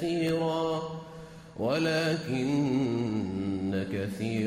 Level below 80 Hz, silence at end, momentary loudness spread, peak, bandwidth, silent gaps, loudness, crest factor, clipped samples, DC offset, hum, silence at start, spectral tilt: -60 dBFS; 0 s; 12 LU; -16 dBFS; 15.5 kHz; none; -30 LUFS; 14 dB; under 0.1%; under 0.1%; none; 0 s; -6.5 dB/octave